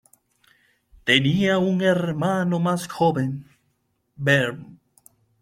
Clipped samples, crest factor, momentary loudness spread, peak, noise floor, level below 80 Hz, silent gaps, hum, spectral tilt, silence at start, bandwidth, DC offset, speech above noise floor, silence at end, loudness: under 0.1%; 22 dB; 10 LU; -2 dBFS; -70 dBFS; -58 dBFS; none; none; -5.5 dB/octave; 1.05 s; 15.5 kHz; under 0.1%; 49 dB; 0.65 s; -21 LUFS